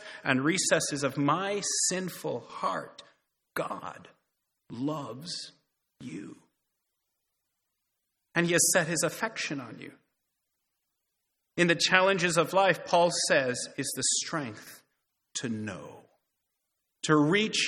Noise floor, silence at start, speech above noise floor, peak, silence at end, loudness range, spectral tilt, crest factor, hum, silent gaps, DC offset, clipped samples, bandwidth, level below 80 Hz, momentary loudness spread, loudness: -82 dBFS; 0 s; 54 dB; -4 dBFS; 0 s; 15 LU; -3 dB/octave; 26 dB; none; none; under 0.1%; under 0.1%; 18 kHz; -72 dBFS; 20 LU; -28 LUFS